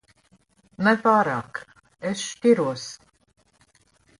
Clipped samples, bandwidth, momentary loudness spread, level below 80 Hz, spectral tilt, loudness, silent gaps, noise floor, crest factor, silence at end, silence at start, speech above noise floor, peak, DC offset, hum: under 0.1%; 11.5 kHz; 18 LU; -66 dBFS; -5 dB/octave; -23 LUFS; none; -62 dBFS; 18 dB; 1.25 s; 0.8 s; 40 dB; -6 dBFS; under 0.1%; none